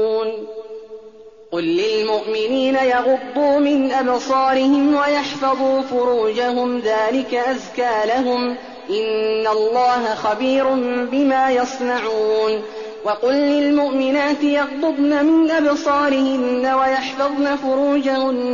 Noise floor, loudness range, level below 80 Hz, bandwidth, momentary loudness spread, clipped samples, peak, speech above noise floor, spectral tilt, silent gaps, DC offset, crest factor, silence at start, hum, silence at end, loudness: -42 dBFS; 3 LU; -58 dBFS; 7.4 kHz; 7 LU; under 0.1%; -8 dBFS; 24 dB; -2 dB/octave; none; 0.2%; 10 dB; 0 s; none; 0 s; -18 LUFS